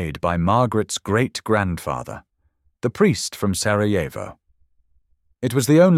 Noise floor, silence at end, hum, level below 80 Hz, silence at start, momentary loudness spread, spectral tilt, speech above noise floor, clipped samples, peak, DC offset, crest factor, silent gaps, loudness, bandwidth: -65 dBFS; 0 s; none; -46 dBFS; 0 s; 11 LU; -5.5 dB/octave; 46 dB; under 0.1%; -4 dBFS; under 0.1%; 18 dB; none; -21 LUFS; 16 kHz